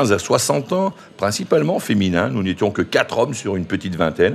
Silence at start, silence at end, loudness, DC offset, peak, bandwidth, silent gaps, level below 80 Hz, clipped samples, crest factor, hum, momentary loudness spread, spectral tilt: 0 s; 0 s; -19 LUFS; under 0.1%; 0 dBFS; 14.5 kHz; none; -52 dBFS; under 0.1%; 18 dB; none; 6 LU; -5 dB/octave